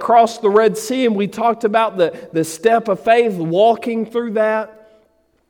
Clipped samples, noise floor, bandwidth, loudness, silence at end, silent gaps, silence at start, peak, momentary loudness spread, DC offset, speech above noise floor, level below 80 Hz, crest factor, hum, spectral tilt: under 0.1%; -59 dBFS; 17 kHz; -16 LUFS; 0.8 s; none; 0 s; -2 dBFS; 7 LU; under 0.1%; 43 dB; -64 dBFS; 14 dB; none; -5 dB/octave